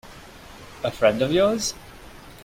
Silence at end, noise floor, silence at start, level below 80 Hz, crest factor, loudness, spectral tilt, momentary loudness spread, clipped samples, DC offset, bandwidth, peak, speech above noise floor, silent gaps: 0 s; -44 dBFS; 0.05 s; -50 dBFS; 20 dB; -22 LUFS; -4 dB/octave; 24 LU; under 0.1%; under 0.1%; 16.5 kHz; -6 dBFS; 22 dB; none